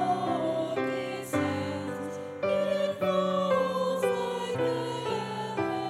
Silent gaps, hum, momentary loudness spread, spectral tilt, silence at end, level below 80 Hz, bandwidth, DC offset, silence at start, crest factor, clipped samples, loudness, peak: none; none; 7 LU; -5.5 dB/octave; 0 s; -72 dBFS; 15.5 kHz; under 0.1%; 0 s; 14 dB; under 0.1%; -30 LUFS; -14 dBFS